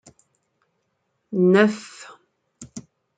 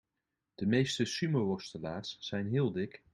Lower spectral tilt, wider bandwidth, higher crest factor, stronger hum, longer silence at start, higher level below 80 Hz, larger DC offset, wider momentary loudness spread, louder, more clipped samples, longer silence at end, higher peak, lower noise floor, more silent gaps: about the same, -6.5 dB/octave vs -5.5 dB/octave; second, 9.2 kHz vs 11.5 kHz; about the same, 20 dB vs 18 dB; neither; first, 1.3 s vs 0.6 s; about the same, -70 dBFS vs -68 dBFS; neither; first, 25 LU vs 10 LU; first, -19 LUFS vs -34 LUFS; neither; first, 0.35 s vs 0.15 s; first, -4 dBFS vs -16 dBFS; second, -73 dBFS vs -87 dBFS; neither